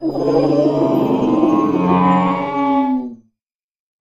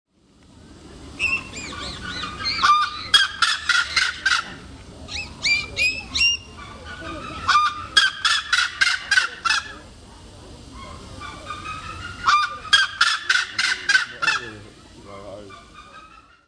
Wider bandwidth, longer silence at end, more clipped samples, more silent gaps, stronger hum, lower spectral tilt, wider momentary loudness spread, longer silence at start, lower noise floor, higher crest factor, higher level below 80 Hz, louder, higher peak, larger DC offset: first, 13.5 kHz vs 10.5 kHz; first, 0.85 s vs 0.25 s; neither; neither; neither; first, -8.5 dB/octave vs -0.5 dB/octave; second, 4 LU vs 21 LU; second, 0 s vs 0.6 s; first, -83 dBFS vs -53 dBFS; second, 16 dB vs 22 dB; about the same, -50 dBFS vs -48 dBFS; first, -16 LUFS vs -19 LUFS; about the same, 0 dBFS vs -2 dBFS; neither